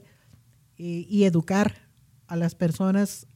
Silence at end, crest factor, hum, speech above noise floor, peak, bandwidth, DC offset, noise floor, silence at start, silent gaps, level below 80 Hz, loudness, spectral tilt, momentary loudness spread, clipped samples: 0.15 s; 16 dB; none; 33 dB; -10 dBFS; 15.5 kHz; under 0.1%; -57 dBFS; 0.8 s; none; -62 dBFS; -25 LUFS; -7 dB/octave; 12 LU; under 0.1%